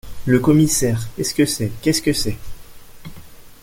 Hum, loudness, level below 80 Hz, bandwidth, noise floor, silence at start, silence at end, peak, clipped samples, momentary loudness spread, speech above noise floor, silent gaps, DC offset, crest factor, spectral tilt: none; -18 LUFS; -38 dBFS; 17 kHz; -38 dBFS; 0.05 s; 0.1 s; -2 dBFS; under 0.1%; 8 LU; 21 dB; none; under 0.1%; 16 dB; -5 dB/octave